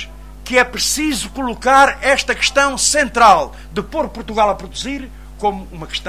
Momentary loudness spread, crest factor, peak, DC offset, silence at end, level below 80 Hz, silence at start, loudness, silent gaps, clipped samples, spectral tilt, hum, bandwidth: 15 LU; 16 dB; 0 dBFS; 0.5%; 0 s; -36 dBFS; 0 s; -15 LUFS; none; under 0.1%; -2 dB/octave; none; 16 kHz